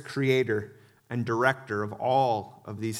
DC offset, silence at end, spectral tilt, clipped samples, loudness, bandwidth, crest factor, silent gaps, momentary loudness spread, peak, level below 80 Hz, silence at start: under 0.1%; 0 s; -6 dB/octave; under 0.1%; -27 LUFS; 15 kHz; 22 dB; none; 11 LU; -6 dBFS; -70 dBFS; 0 s